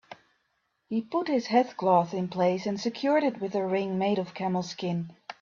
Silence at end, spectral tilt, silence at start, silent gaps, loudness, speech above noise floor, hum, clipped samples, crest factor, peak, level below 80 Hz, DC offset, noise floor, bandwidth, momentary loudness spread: 0.1 s; -6.5 dB/octave; 0.1 s; none; -28 LUFS; 48 dB; none; under 0.1%; 20 dB; -10 dBFS; -72 dBFS; under 0.1%; -76 dBFS; 7.4 kHz; 8 LU